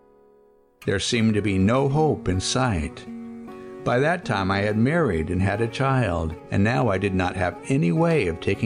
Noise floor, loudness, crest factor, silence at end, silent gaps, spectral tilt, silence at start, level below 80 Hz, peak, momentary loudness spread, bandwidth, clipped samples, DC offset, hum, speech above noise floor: -57 dBFS; -23 LUFS; 12 dB; 0 s; none; -6 dB/octave; 0.8 s; -44 dBFS; -10 dBFS; 11 LU; 10.5 kHz; under 0.1%; under 0.1%; none; 35 dB